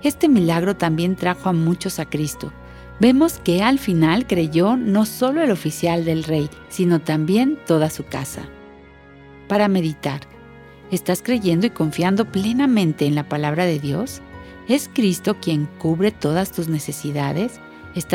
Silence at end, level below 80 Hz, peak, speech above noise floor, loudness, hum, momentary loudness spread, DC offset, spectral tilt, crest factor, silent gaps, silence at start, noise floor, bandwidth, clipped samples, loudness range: 0 s; -48 dBFS; -2 dBFS; 25 dB; -20 LUFS; none; 11 LU; under 0.1%; -6 dB/octave; 18 dB; none; 0 s; -44 dBFS; 17 kHz; under 0.1%; 4 LU